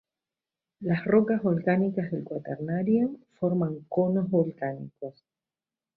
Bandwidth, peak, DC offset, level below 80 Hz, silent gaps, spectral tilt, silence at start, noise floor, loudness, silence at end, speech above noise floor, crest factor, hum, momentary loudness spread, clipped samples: 4.6 kHz; -10 dBFS; under 0.1%; -68 dBFS; none; -12 dB/octave; 0.8 s; under -90 dBFS; -27 LUFS; 0.85 s; over 63 dB; 18 dB; none; 13 LU; under 0.1%